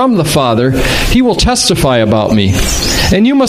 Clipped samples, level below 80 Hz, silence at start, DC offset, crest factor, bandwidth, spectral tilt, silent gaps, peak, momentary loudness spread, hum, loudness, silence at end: under 0.1%; -20 dBFS; 0 s; under 0.1%; 10 dB; 15.5 kHz; -4.5 dB/octave; none; 0 dBFS; 2 LU; none; -10 LUFS; 0 s